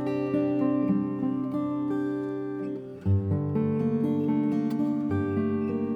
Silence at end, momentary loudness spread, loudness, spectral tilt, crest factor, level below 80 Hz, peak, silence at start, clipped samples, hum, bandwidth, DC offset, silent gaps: 0 s; 6 LU; -28 LUFS; -10.5 dB/octave; 12 dB; -62 dBFS; -14 dBFS; 0 s; under 0.1%; none; 5 kHz; under 0.1%; none